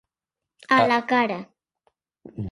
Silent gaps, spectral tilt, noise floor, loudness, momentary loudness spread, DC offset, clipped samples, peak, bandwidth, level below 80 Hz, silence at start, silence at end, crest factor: none; -5.5 dB/octave; -88 dBFS; -21 LUFS; 17 LU; under 0.1%; under 0.1%; -4 dBFS; 11.5 kHz; -58 dBFS; 0.7 s; 0 s; 22 dB